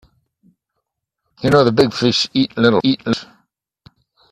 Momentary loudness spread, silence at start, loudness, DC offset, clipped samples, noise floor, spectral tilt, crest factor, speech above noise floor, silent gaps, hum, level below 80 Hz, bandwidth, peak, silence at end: 10 LU; 1.4 s; -16 LUFS; under 0.1%; under 0.1%; -76 dBFS; -5.5 dB/octave; 18 dB; 61 dB; none; none; -52 dBFS; 12.5 kHz; 0 dBFS; 1.1 s